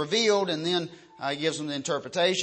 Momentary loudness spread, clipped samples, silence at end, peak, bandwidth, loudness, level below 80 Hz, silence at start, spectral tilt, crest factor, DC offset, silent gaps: 10 LU; under 0.1%; 0 s; -12 dBFS; 8.8 kHz; -27 LUFS; -74 dBFS; 0 s; -3.5 dB/octave; 16 dB; under 0.1%; none